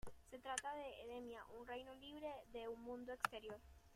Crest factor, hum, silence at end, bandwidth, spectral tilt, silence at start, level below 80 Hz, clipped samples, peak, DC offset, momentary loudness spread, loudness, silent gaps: 30 dB; none; 0 s; 16 kHz; -2.5 dB/octave; 0 s; -70 dBFS; under 0.1%; -20 dBFS; under 0.1%; 10 LU; -51 LUFS; none